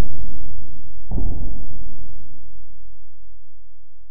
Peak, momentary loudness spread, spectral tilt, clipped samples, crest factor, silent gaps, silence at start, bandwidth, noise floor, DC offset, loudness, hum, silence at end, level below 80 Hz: -2 dBFS; 26 LU; -14 dB/octave; under 0.1%; 8 dB; none; 0 s; 1 kHz; -43 dBFS; 30%; -35 LUFS; none; 0 s; -32 dBFS